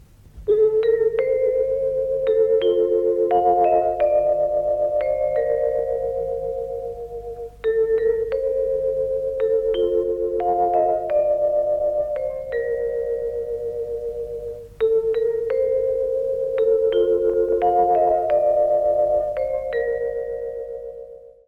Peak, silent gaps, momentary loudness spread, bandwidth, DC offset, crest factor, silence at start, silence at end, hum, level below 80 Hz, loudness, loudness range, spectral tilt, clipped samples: -8 dBFS; none; 11 LU; 4.3 kHz; under 0.1%; 14 dB; 0.35 s; 0.2 s; none; -46 dBFS; -21 LUFS; 5 LU; -7.5 dB/octave; under 0.1%